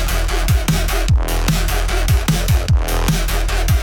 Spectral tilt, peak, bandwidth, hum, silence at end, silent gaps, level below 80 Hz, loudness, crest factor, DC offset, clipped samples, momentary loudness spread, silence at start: -4.5 dB/octave; -4 dBFS; 17.5 kHz; none; 0 s; none; -18 dBFS; -18 LUFS; 10 dB; under 0.1%; under 0.1%; 3 LU; 0 s